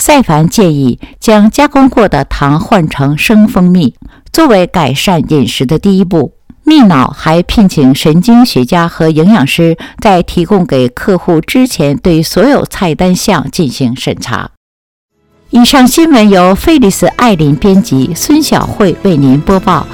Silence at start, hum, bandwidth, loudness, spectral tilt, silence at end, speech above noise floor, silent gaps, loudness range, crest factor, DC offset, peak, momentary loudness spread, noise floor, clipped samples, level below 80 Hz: 0 s; none; 18.5 kHz; -7 LUFS; -5.5 dB/octave; 0 s; over 83 dB; 14.57-15.08 s; 3 LU; 8 dB; 0.5%; 0 dBFS; 7 LU; under -90 dBFS; 3%; -28 dBFS